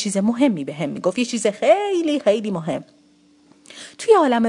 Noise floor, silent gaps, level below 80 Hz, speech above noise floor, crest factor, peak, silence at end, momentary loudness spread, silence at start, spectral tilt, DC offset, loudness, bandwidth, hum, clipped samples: -55 dBFS; none; -70 dBFS; 36 dB; 18 dB; -2 dBFS; 0 s; 12 LU; 0 s; -5 dB/octave; under 0.1%; -20 LUFS; 11 kHz; none; under 0.1%